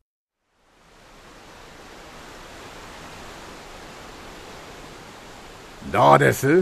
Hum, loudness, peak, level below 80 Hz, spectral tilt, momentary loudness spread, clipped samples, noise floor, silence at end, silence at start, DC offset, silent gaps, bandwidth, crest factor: none; -17 LUFS; 0 dBFS; -50 dBFS; -5.5 dB/octave; 27 LU; under 0.1%; -65 dBFS; 0 s; 2.65 s; under 0.1%; none; 14 kHz; 24 dB